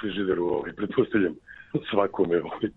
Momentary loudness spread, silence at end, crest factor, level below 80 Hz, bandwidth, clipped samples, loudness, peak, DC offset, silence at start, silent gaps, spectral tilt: 7 LU; 0.05 s; 20 dB; -58 dBFS; 4.1 kHz; under 0.1%; -26 LUFS; -8 dBFS; under 0.1%; 0 s; none; -9 dB/octave